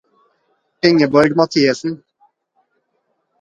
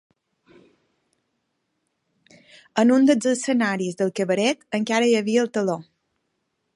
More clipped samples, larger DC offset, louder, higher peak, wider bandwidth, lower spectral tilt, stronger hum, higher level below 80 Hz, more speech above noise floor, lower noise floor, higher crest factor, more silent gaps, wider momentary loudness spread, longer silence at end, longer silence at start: neither; neither; first, -15 LUFS vs -21 LUFS; first, 0 dBFS vs -4 dBFS; about the same, 10.5 kHz vs 11.5 kHz; about the same, -5.5 dB/octave vs -4.5 dB/octave; neither; first, -58 dBFS vs -74 dBFS; about the same, 55 dB vs 54 dB; second, -68 dBFS vs -75 dBFS; about the same, 18 dB vs 20 dB; neither; first, 13 LU vs 9 LU; first, 1.45 s vs 0.95 s; second, 0.85 s vs 2.75 s